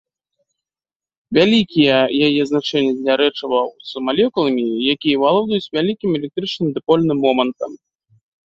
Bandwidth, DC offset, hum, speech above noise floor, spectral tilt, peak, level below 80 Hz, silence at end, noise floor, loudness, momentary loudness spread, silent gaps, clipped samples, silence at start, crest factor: 7.8 kHz; under 0.1%; none; over 73 dB; -6.5 dB/octave; -2 dBFS; -58 dBFS; 0.7 s; under -90 dBFS; -17 LUFS; 8 LU; none; under 0.1%; 1.3 s; 16 dB